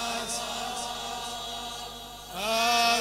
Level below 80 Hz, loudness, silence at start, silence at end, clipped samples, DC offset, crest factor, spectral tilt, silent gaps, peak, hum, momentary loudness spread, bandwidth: -54 dBFS; -29 LUFS; 0 s; 0 s; under 0.1%; under 0.1%; 22 dB; -1 dB/octave; none; -8 dBFS; 50 Hz at -55 dBFS; 15 LU; 16 kHz